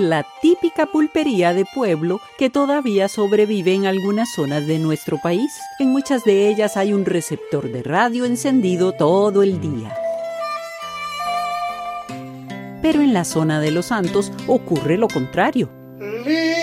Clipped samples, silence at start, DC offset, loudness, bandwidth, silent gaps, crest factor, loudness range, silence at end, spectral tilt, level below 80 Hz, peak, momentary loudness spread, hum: under 0.1%; 0 s; under 0.1%; -19 LUFS; 16 kHz; none; 16 dB; 3 LU; 0 s; -5.5 dB/octave; -56 dBFS; -2 dBFS; 10 LU; none